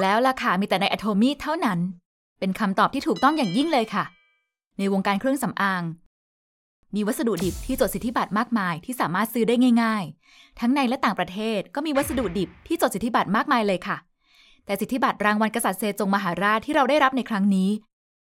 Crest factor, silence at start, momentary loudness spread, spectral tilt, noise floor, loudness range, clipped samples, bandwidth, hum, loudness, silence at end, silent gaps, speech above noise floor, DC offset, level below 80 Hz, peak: 18 dB; 0 s; 8 LU; -5 dB/octave; -71 dBFS; 4 LU; under 0.1%; 16.5 kHz; none; -23 LUFS; 0.55 s; 2.05-2.36 s, 4.67-4.71 s, 6.06-6.83 s; 48 dB; under 0.1%; -50 dBFS; -6 dBFS